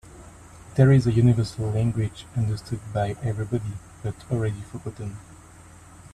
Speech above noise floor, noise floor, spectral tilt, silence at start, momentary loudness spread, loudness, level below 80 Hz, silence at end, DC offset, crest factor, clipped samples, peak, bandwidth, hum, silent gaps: 24 dB; -47 dBFS; -8 dB/octave; 0.05 s; 17 LU; -24 LUFS; -48 dBFS; 0.05 s; under 0.1%; 20 dB; under 0.1%; -4 dBFS; 11 kHz; none; none